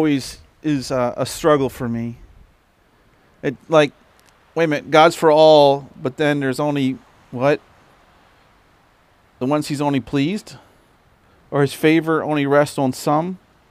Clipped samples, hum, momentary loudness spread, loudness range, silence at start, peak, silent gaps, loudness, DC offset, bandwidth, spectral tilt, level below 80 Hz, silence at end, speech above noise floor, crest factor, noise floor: under 0.1%; none; 15 LU; 9 LU; 0 s; 0 dBFS; none; -18 LUFS; under 0.1%; 16 kHz; -5.5 dB/octave; -54 dBFS; 0.35 s; 40 dB; 18 dB; -57 dBFS